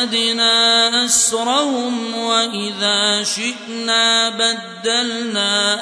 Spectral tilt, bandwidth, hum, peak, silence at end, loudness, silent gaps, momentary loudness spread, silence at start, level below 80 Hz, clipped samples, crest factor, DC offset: -0.5 dB/octave; 11 kHz; none; -2 dBFS; 0 s; -15 LUFS; none; 9 LU; 0 s; -64 dBFS; under 0.1%; 14 dB; under 0.1%